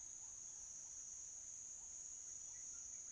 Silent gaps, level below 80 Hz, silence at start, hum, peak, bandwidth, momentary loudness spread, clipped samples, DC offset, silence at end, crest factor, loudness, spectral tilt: none; -78 dBFS; 0 s; none; -42 dBFS; 11 kHz; 1 LU; under 0.1%; under 0.1%; 0 s; 12 dB; -50 LUFS; 0.5 dB/octave